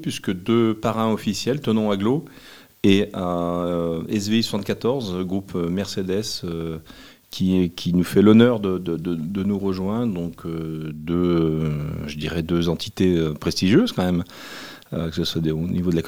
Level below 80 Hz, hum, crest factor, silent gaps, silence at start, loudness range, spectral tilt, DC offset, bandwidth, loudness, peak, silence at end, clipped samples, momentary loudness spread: -50 dBFS; none; 20 dB; none; 0 s; 4 LU; -6.5 dB/octave; 0.3%; 16.5 kHz; -22 LUFS; -2 dBFS; 0 s; under 0.1%; 11 LU